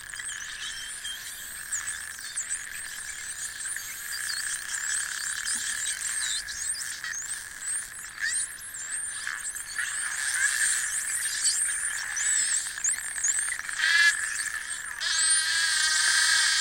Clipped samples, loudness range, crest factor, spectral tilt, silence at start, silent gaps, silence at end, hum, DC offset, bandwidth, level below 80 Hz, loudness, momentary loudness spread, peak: under 0.1%; 8 LU; 22 dB; 3.5 dB/octave; 0 s; none; 0 s; none; under 0.1%; 17 kHz; -62 dBFS; -27 LUFS; 13 LU; -8 dBFS